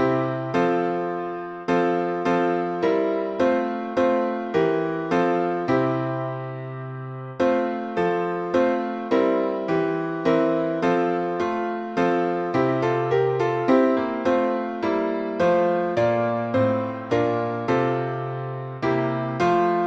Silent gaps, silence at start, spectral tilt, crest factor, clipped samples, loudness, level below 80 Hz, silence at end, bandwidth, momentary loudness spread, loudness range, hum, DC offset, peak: none; 0 s; -7.5 dB/octave; 16 dB; under 0.1%; -23 LUFS; -60 dBFS; 0 s; 7.8 kHz; 6 LU; 3 LU; none; under 0.1%; -6 dBFS